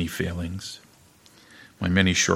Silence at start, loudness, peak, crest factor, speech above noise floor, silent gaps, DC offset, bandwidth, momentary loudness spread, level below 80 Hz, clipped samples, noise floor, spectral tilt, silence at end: 0 s; -25 LUFS; -4 dBFS; 22 dB; 31 dB; none; under 0.1%; 16 kHz; 18 LU; -48 dBFS; under 0.1%; -55 dBFS; -4 dB/octave; 0 s